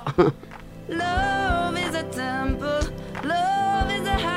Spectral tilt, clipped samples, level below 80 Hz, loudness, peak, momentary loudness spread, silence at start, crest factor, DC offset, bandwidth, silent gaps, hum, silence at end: -5.5 dB/octave; under 0.1%; -36 dBFS; -24 LUFS; -4 dBFS; 9 LU; 0 s; 20 dB; under 0.1%; 16 kHz; none; none; 0 s